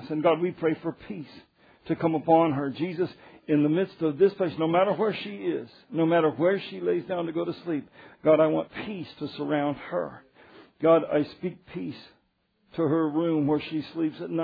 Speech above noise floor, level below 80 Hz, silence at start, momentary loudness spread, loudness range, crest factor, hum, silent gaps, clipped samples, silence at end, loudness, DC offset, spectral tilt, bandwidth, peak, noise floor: 45 dB; -68 dBFS; 0 s; 15 LU; 3 LU; 20 dB; none; none; under 0.1%; 0 s; -26 LUFS; under 0.1%; -10 dB/octave; 5 kHz; -8 dBFS; -71 dBFS